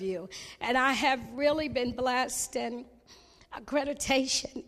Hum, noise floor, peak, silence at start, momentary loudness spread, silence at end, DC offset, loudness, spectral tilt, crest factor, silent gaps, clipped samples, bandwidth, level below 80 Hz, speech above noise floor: none; -57 dBFS; -12 dBFS; 0 s; 13 LU; 0.05 s; under 0.1%; -29 LUFS; -2.5 dB/octave; 18 dB; none; under 0.1%; 15 kHz; -56 dBFS; 27 dB